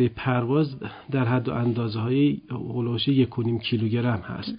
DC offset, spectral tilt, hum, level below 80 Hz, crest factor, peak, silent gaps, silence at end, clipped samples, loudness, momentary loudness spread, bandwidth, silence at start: under 0.1%; -12 dB/octave; none; -52 dBFS; 14 dB; -10 dBFS; none; 0 s; under 0.1%; -25 LUFS; 7 LU; 5.2 kHz; 0 s